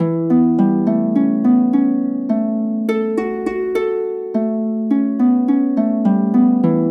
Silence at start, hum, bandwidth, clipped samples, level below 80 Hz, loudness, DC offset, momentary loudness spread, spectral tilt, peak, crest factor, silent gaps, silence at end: 0 s; none; 4.7 kHz; under 0.1%; -58 dBFS; -17 LUFS; under 0.1%; 6 LU; -10 dB/octave; -4 dBFS; 12 dB; none; 0 s